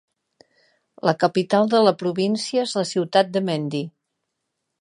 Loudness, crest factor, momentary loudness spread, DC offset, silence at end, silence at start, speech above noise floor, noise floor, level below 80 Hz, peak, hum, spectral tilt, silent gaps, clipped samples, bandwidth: -21 LUFS; 20 dB; 8 LU; under 0.1%; 0.9 s; 1.05 s; 58 dB; -78 dBFS; -72 dBFS; -2 dBFS; none; -5.5 dB/octave; none; under 0.1%; 11 kHz